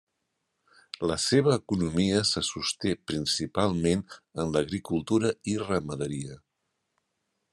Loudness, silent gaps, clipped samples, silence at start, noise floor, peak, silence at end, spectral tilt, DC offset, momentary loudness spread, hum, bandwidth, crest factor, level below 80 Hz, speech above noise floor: -28 LUFS; none; under 0.1%; 1 s; -80 dBFS; -10 dBFS; 1.15 s; -4.5 dB/octave; under 0.1%; 9 LU; none; 13 kHz; 20 dB; -58 dBFS; 52 dB